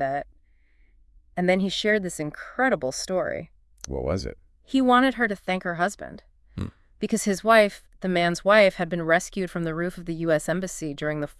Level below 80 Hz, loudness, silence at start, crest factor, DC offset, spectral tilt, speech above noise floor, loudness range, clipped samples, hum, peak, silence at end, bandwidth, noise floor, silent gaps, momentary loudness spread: -48 dBFS; -24 LUFS; 0 s; 20 dB; under 0.1%; -4.5 dB/octave; 35 dB; 4 LU; under 0.1%; none; -4 dBFS; 0.1 s; 12 kHz; -59 dBFS; none; 18 LU